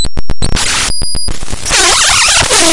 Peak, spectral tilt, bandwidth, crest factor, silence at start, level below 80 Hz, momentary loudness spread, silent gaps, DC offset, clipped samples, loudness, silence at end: 0 dBFS; -1 dB/octave; 12 kHz; 10 dB; 0 s; -20 dBFS; 13 LU; none; under 0.1%; 0.6%; -9 LUFS; 0 s